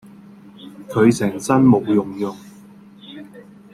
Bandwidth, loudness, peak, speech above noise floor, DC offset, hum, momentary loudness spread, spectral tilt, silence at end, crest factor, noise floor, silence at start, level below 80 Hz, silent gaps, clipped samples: 14 kHz; -17 LUFS; -2 dBFS; 27 dB; under 0.1%; none; 25 LU; -7 dB/octave; 0.3 s; 18 dB; -44 dBFS; 0.6 s; -58 dBFS; none; under 0.1%